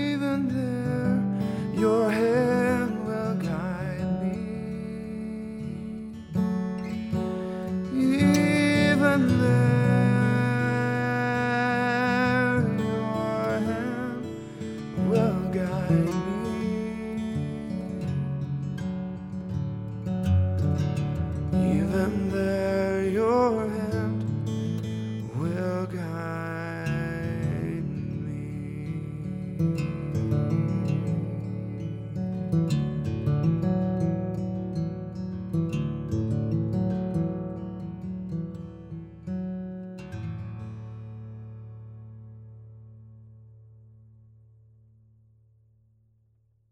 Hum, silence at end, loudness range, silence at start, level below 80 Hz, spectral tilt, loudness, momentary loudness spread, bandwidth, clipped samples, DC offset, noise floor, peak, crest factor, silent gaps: none; 2.95 s; 13 LU; 0 s; -50 dBFS; -7.5 dB/octave; -27 LUFS; 14 LU; 13 kHz; under 0.1%; under 0.1%; -66 dBFS; -8 dBFS; 18 dB; none